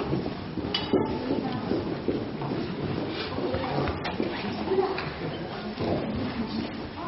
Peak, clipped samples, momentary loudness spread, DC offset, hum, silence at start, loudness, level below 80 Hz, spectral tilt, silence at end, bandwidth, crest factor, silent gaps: -12 dBFS; under 0.1%; 6 LU; under 0.1%; none; 0 s; -30 LUFS; -48 dBFS; -5 dB/octave; 0 s; 6 kHz; 18 dB; none